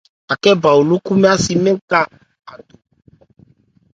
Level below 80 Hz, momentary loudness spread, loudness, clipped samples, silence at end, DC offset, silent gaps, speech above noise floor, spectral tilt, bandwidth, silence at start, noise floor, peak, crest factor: -50 dBFS; 5 LU; -14 LUFS; under 0.1%; 1.4 s; under 0.1%; 1.81-1.88 s; 38 dB; -5 dB/octave; 9.2 kHz; 0.3 s; -52 dBFS; 0 dBFS; 16 dB